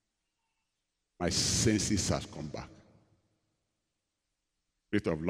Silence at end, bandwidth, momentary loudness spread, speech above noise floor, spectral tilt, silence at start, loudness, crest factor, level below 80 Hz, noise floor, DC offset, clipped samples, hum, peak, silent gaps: 0 s; 16 kHz; 16 LU; 54 dB; -3.5 dB/octave; 1.2 s; -31 LUFS; 20 dB; -54 dBFS; -85 dBFS; under 0.1%; under 0.1%; none; -14 dBFS; none